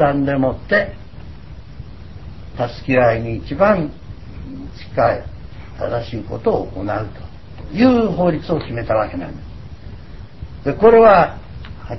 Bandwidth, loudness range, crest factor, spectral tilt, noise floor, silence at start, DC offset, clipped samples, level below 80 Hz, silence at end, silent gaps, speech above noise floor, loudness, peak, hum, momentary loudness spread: 6 kHz; 7 LU; 18 dB; -8.5 dB/octave; -36 dBFS; 0 s; 1%; under 0.1%; -36 dBFS; 0 s; none; 20 dB; -17 LUFS; 0 dBFS; none; 23 LU